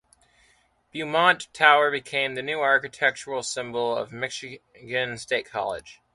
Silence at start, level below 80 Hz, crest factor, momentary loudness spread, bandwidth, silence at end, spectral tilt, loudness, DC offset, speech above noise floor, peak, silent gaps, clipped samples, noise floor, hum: 0.95 s; -66 dBFS; 24 dB; 15 LU; 11.5 kHz; 0.2 s; -2.5 dB/octave; -24 LUFS; under 0.1%; 38 dB; -2 dBFS; none; under 0.1%; -63 dBFS; none